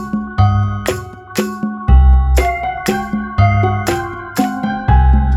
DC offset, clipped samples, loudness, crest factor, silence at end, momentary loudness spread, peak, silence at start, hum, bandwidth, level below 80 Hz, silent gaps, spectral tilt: under 0.1%; under 0.1%; -15 LUFS; 14 dB; 0 s; 9 LU; 0 dBFS; 0 s; none; 13.5 kHz; -16 dBFS; none; -6.5 dB/octave